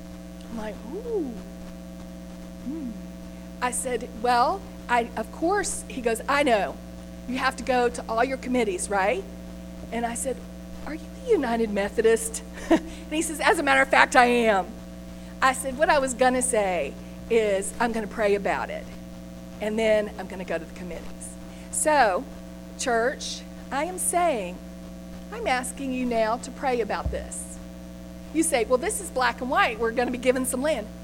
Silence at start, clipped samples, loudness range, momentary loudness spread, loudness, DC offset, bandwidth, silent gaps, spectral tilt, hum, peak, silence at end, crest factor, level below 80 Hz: 0 s; under 0.1%; 7 LU; 19 LU; -25 LUFS; under 0.1%; 17.5 kHz; none; -3.5 dB/octave; 60 Hz at -40 dBFS; -2 dBFS; 0 s; 24 dB; -44 dBFS